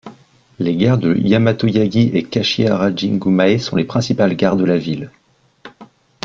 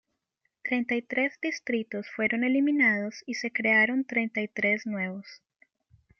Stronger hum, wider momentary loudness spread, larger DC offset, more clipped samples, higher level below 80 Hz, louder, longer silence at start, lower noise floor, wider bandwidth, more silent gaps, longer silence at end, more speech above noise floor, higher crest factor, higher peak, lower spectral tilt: neither; second, 5 LU vs 11 LU; neither; neither; first, -50 dBFS vs -76 dBFS; first, -16 LUFS vs -27 LUFS; second, 0.05 s vs 0.65 s; second, -46 dBFS vs -79 dBFS; about the same, 7.4 kHz vs 7 kHz; neither; second, 0.4 s vs 0.85 s; second, 31 dB vs 51 dB; about the same, 14 dB vs 18 dB; first, -2 dBFS vs -10 dBFS; first, -7 dB/octave vs -5 dB/octave